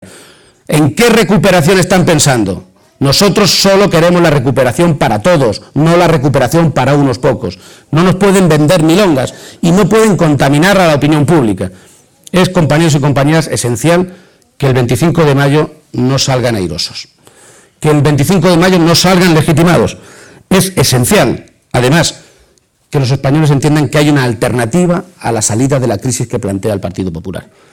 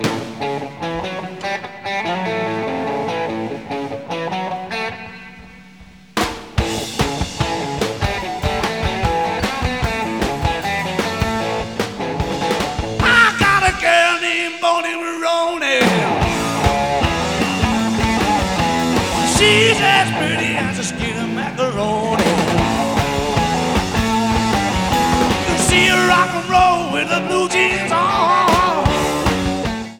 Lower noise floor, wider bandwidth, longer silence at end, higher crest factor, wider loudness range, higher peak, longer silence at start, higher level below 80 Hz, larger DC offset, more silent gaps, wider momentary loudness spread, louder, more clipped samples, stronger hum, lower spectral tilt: first, -51 dBFS vs -42 dBFS; about the same, 19.5 kHz vs over 20 kHz; first, 0.3 s vs 0 s; second, 10 dB vs 18 dB; second, 4 LU vs 8 LU; about the same, 0 dBFS vs 0 dBFS; about the same, 0 s vs 0 s; about the same, -34 dBFS vs -32 dBFS; second, under 0.1% vs 0.2%; neither; about the same, 9 LU vs 11 LU; first, -10 LUFS vs -17 LUFS; neither; neither; about the same, -5 dB/octave vs -4 dB/octave